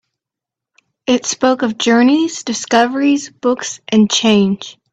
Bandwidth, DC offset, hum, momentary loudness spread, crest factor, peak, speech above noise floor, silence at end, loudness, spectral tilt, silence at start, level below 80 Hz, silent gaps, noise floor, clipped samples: 8.4 kHz; under 0.1%; none; 8 LU; 16 dB; 0 dBFS; 71 dB; 0.2 s; -14 LUFS; -4 dB/octave; 1.1 s; -58 dBFS; none; -85 dBFS; under 0.1%